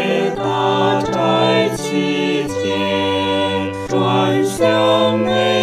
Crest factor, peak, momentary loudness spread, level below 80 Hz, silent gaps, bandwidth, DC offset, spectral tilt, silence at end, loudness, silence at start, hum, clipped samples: 14 dB; -2 dBFS; 5 LU; -50 dBFS; none; 15 kHz; under 0.1%; -5 dB/octave; 0 s; -16 LUFS; 0 s; none; under 0.1%